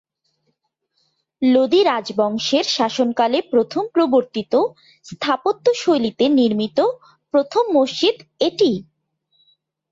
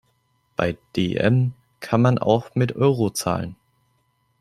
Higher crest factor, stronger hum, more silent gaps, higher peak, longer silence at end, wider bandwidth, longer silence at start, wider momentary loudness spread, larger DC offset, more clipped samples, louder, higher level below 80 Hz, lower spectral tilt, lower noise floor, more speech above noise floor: second, 14 dB vs 20 dB; neither; neither; about the same, -4 dBFS vs -2 dBFS; first, 1.1 s vs 0.85 s; second, 7.8 kHz vs 14 kHz; first, 1.4 s vs 0.6 s; second, 6 LU vs 9 LU; neither; neither; first, -18 LUFS vs -22 LUFS; second, -64 dBFS vs -54 dBFS; second, -4.5 dB/octave vs -6.5 dB/octave; first, -71 dBFS vs -67 dBFS; first, 53 dB vs 47 dB